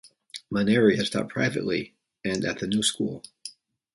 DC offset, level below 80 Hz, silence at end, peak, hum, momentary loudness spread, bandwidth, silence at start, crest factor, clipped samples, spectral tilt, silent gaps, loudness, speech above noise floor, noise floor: under 0.1%; -60 dBFS; 0.45 s; -8 dBFS; none; 21 LU; 11.5 kHz; 0.05 s; 20 dB; under 0.1%; -4.5 dB/octave; none; -25 LUFS; 21 dB; -46 dBFS